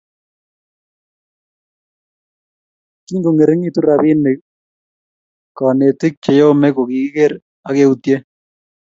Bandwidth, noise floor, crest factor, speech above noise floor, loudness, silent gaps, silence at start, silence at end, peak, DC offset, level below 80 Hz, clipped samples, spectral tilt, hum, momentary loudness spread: 7.6 kHz; under -90 dBFS; 16 dB; over 77 dB; -14 LUFS; 4.41-5.55 s, 6.17-6.22 s, 7.42-7.63 s; 3.1 s; 0.6 s; 0 dBFS; under 0.1%; -62 dBFS; under 0.1%; -8 dB/octave; none; 8 LU